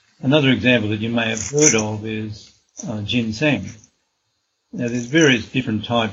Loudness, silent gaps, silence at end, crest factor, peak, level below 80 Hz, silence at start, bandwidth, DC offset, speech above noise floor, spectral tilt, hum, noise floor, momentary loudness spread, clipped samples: -18 LUFS; none; 0 s; 20 dB; 0 dBFS; -54 dBFS; 0.2 s; 8 kHz; under 0.1%; 52 dB; -4 dB/octave; none; -71 dBFS; 18 LU; under 0.1%